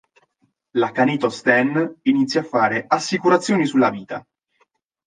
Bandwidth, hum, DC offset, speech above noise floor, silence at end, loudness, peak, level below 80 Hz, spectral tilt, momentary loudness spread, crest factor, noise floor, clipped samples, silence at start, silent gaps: 9.6 kHz; none; under 0.1%; 47 dB; 0.85 s; -19 LUFS; -2 dBFS; -68 dBFS; -5 dB/octave; 7 LU; 18 dB; -66 dBFS; under 0.1%; 0.75 s; none